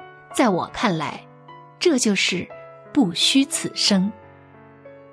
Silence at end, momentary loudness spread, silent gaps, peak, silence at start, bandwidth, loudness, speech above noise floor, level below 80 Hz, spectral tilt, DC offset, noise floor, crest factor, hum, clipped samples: 0.15 s; 13 LU; none; -6 dBFS; 0 s; 11 kHz; -20 LUFS; 27 dB; -60 dBFS; -3.5 dB/octave; under 0.1%; -47 dBFS; 16 dB; none; under 0.1%